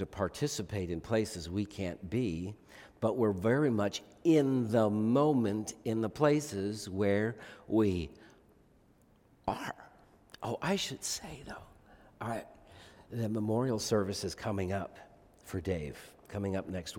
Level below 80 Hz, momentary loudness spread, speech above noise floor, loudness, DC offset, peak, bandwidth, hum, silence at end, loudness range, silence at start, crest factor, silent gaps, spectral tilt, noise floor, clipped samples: -62 dBFS; 15 LU; 32 dB; -33 LUFS; under 0.1%; -12 dBFS; 17 kHz; none; 0 s; 9 LU; 0 s; 22 dB; none; -5.5 dB/octave; -65 dBFS; under 0.1%